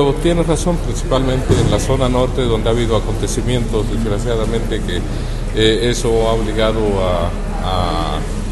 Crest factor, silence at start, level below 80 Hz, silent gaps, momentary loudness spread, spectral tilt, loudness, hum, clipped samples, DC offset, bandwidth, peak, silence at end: 16 dB; 0 s; -20 dBFS; none; 6 LU; -5.5 dB/octave; -17 LUFS; none; under 0.1%; under 0.1%; 12.5 kHz; 0 dBFS; 0 s